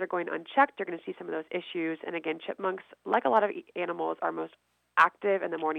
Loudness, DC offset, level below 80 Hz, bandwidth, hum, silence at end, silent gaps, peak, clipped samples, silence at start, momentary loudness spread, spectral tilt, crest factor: -30 LUFS; under 0.1%; -84 dBFS; 9 kHz; none; 0 s; none; -6 dBFS; under 0.1%; 0 s; 12 LU; -6 dB/octave; 24 dB